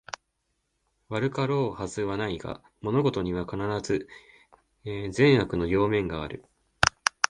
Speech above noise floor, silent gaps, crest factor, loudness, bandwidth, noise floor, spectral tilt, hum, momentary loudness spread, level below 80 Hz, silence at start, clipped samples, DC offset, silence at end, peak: 50 dB; none; 26 dB; -27 LUFS; 11.5 kHz; -77 dBFS; -5 dB/octave; none; 16 LU; -50 dBFS; 1.1 s; under 0.1%; under 0.1%; 0.05 s; -2 dBFS